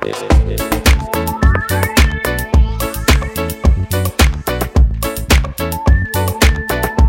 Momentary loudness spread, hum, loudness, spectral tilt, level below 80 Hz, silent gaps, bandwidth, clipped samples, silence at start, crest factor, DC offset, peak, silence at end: 4 LU; none; -15 LUFS; -5 dB/octave; -16 dBFS; none; 16.5 kHz; under 0.1%; 0 s; 14 dB; under 0.1%; 0 dBFS; 0 s